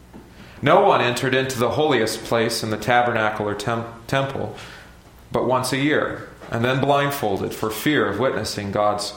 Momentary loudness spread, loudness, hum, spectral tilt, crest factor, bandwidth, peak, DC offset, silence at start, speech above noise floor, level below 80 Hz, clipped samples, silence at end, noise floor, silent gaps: 10 LU; -21 LUFS; none; -5 dB/octave; 20 dB; 17 kHz; -2 dBFS; under 0.1%; 0.15 s; 24 dB; -50 dBFS; under 0.1%; 0 s; -45 dBFS; none